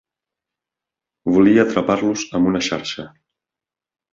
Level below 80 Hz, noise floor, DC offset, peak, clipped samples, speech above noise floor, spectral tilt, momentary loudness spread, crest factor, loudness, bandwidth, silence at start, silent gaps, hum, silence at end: -52 dBFS; -89 dBFS; under 0.1%; -2 dBFS; under 0.1%; 72 dB; -5 dB/octave; 14 LU; 18 dB; -17 LUFS; 7.6 kHz; 1.25 s; none; none; 1.05 s